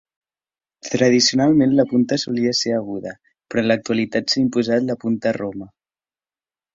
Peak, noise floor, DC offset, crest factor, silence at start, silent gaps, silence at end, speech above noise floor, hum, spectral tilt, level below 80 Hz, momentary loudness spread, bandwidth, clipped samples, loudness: -2 dBFS; under -90 dBFS; under 0.1%; 18 dB; 0.85 s; none; 1.1 s; over 72 dB; none; -4.5 dB/octave; -58 dBFS; 15 LU; 7.8 kHz; under 0.1%; -19 LUFS